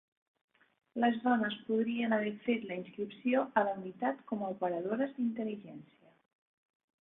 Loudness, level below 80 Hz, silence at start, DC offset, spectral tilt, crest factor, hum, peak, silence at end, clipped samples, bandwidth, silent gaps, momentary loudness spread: -34 LUFS; -82 dBFS; 0.95 s; under 0.1%; -9 dB/octave; 22 dB; none; -14 dBFS; 1.15 s; under 0.1%; 3.9 kHz; none; 11 LU